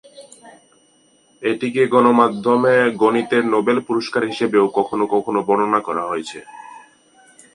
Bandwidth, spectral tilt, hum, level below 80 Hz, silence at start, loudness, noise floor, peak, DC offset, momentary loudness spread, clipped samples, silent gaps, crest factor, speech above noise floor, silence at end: 11 kHz; -6 dB/octave; none; -66 dBFS; 0.15 s; -17 LUFS; -56 dBFS; 0 dBFS; under 0.1%; 11 LU; under 0.1%; none; 18 dB; 39 dB; 0.75 s